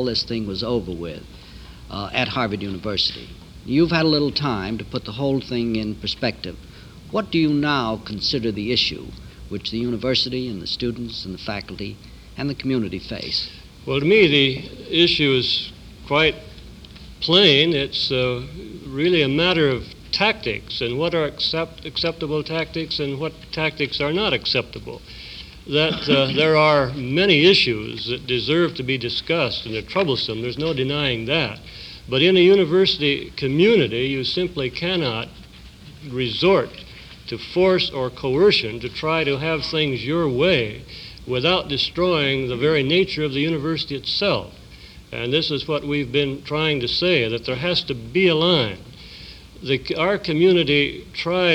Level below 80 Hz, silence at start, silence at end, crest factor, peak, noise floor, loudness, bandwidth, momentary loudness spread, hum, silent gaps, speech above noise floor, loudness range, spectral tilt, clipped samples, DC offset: -46 dBFS; 0 s; 0 s; 20 dB; -2 dBFS; -42 dBFS; -20 LUFS; 11.5 kHz; 17 LU; none; none; 22 dB; 6 LU; -6 dB/octave; under 0.1%; under 0.1%